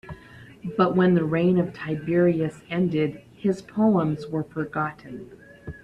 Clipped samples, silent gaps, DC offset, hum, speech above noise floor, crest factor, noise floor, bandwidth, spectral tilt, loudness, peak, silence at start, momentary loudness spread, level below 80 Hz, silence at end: under 0.1%; none; under 0.1%; none; 24 dB; 18 dB; -47 dBFS; 8.2 kHz; -9 dB/octave; -24 LUFS; -6 dBFS; 0.05 s; 20 LU; -56 dBFS; 0.05 s